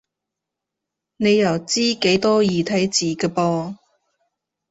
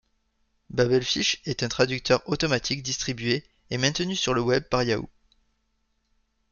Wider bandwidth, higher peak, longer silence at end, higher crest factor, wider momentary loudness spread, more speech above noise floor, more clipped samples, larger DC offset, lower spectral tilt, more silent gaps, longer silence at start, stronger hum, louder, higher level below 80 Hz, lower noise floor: about the same, 8 kHz vs 7.4 kHz; first, -2 dBFS vs -6 dBFS; second, 0.95 s vs 1.45 s; about the same, 18 dB vs 20 dB; about the same, 6 LU vs 6 LU; first, 65 dB vs 47 dB; neither; neither; about the same, -4.5 dB/octave vs -4 dB/octave; neither; first, 1.2 s vs 0.7 s; neither; first, -19 LUFS vs -25 LUFS; second, -58 dBFS vs -52 dBFS; first, -83 dBFS vs -72 dBFS